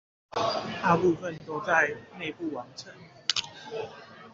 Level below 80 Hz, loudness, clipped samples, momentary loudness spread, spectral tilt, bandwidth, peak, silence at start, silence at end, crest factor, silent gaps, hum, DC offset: -66 dBFS; -29 LUFS; under 0.1%; 17 LU; -2.5 dB/octave; 8 kHz; -4 dBFS; 0.35 s; 0 s; 26 dB; none; none; under 0.1%